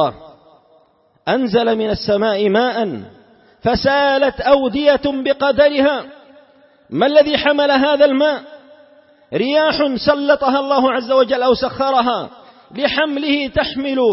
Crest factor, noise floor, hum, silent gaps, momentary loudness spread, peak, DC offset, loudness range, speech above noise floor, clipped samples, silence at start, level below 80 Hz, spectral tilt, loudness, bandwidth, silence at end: 16 dB; -55 dBFS; none; none; 9 LU; -2 dBFS; under 0.1%; 2 LU; 40 dB; under 0.1%; 0 s; -44 dBFS; -8.5 dB/octave; -16 LUFS; 5.8 kHz; 0 s